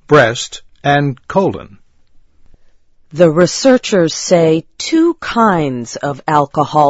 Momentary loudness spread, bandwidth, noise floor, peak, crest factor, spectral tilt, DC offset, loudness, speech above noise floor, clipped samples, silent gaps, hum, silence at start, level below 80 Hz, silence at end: 10 LU; 8 kHz; -45 dBFS; 0 dBFS; 14 dB; -5 dB/octave; under 0.1%; -13 LUFS; 33 dB; 0.2%; none; none; 0.1 s; -46 dBFS; 0 s